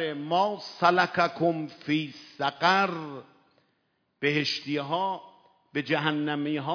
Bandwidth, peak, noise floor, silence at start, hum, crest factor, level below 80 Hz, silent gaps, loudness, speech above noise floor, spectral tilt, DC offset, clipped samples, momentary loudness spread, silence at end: 5.4 kHz; -8 dBFS; -74 dBFS; 0 s; none; 20 dB; -80 dBFS; none; -27 LUFS; 47 dB; -5.5 dB/octave; under 0.1%; under 0.1%; 12 LU; 0 s